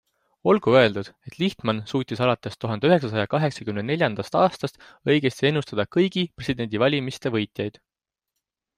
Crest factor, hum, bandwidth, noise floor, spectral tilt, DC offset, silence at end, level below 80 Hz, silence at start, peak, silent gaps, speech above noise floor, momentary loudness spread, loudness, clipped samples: 20 dB; none; 14.5 kHz; -84 dBFS; -6.5 dB/octave; under 0.1%; 1.1 s; -60 dBFS; 0.45 s; -4 dBFS; none; 61 dB; 10 LU; -23 LUFS; under 0.1%